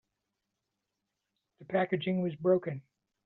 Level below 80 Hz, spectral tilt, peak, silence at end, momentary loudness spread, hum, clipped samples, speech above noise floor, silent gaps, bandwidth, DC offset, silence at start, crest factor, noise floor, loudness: -76 dBFS; -6 dB/octave; -16 dBFS; 0.45 s; 10 LU; none; under 0.1%; 55 dB; none; 4.1 kHz; under 0.1%; 1.6 s; 20 dB; -86 dBFS; -31 LUFS